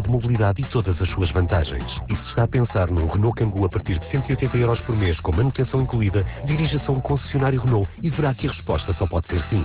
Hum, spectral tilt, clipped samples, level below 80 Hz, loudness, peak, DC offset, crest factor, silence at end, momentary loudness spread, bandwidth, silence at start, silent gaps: none; -11.5 dB/octave; under 0.1%; -30 dBFS; -22 LUFS; -8 dBFS; under 0.1%; 12 dB; 0 s; 4 LU; 4 kHz; 0 s; none